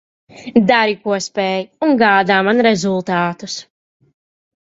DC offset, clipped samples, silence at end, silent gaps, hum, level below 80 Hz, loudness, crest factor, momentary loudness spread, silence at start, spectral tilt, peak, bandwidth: under 0.1%; under 0.1%; 1.1 s; none; none; -58 dBFS; -15 LUFS; 16 dB; 12 LU; 0.35 s; -5 dB/octave; 0 dBFS; 8 kHz